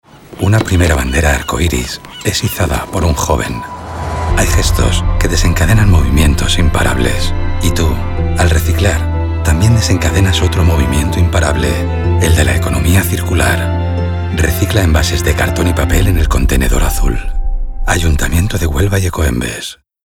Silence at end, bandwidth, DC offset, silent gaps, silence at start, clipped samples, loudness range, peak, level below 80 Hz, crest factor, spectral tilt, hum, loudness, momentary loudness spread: 0.3 s; 17.5 kHz; under 0.1%; none; 0.3 s; under 0.1%; 3 LU; 0 dBFS; -16 dBFS; 12 dB; -5 dB/octave; none; -13 LUFS; 7 LU